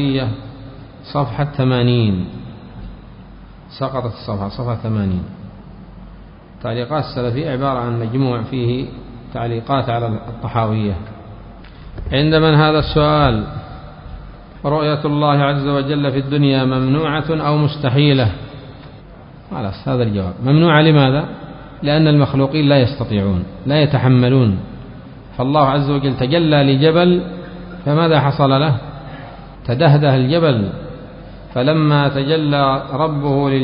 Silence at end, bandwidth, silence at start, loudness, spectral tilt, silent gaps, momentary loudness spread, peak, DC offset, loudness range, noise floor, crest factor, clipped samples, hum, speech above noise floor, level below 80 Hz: 0 s; 5.4 kHz; 0 s; -16 LUFS; -12 dB/octave; none; 21 LU; 0 dBFS; under 0.1%; 8 LU; -38 dBFS; 16 dB; under 0.1%; none; 23 dB; -36 dBFS